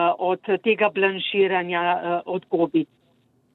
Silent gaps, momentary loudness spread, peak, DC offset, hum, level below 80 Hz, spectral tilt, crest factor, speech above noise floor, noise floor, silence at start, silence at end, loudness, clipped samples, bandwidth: none; 6 LU; -6 dBFS; under 0.1%; none; -72 dBFS; -8 dB/octave; 16 dB; 41 dB; -63 dBFS; 0 s; 0.7 s; -22 LUFS; under 0.1%; 4.2 kHz